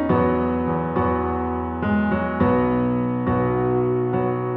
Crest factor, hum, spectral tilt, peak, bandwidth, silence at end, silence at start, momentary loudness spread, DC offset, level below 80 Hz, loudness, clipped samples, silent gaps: 14 dB; none; -12 dB/octave; -6 dBFS; 4.1 kHz; 0 s; 0 s; 4 LU; under 0.1%; -40 dBFS; -21 LUFS; under 0.1%; none